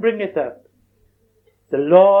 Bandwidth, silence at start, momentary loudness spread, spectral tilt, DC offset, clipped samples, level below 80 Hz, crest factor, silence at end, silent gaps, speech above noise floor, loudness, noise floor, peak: 3.8 kHz; 0 s; 14 LU; -9 dB/octave; under 0.1%; under 0.1%; -66 dBFS; 18 dB; 0 s; none; 45 dB; -17 LUFS; -60 dBFS; 0 dBFS